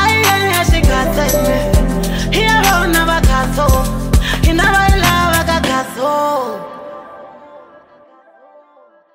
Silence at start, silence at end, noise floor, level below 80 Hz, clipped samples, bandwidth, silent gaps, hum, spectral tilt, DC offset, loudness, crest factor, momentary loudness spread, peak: 0 s; 1.55 s; -48 dBFS; -20 dBFS; under 0.1%; 16.5 kHz; none; none; -4.5 dB/octave; under 0.1%; -13 LUFS; 12 dB; 7 LU; -2 dBFS